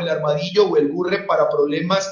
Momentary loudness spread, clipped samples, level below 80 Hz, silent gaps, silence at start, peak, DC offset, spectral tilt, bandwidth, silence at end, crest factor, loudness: 4 LU; under 0.1%; -64 dBFS; none; 0 s; -4 dBFS; under 0.1%; -5.5 dB/octave; 7.4 kHz; 0 s; 14 dB; -19 LUFS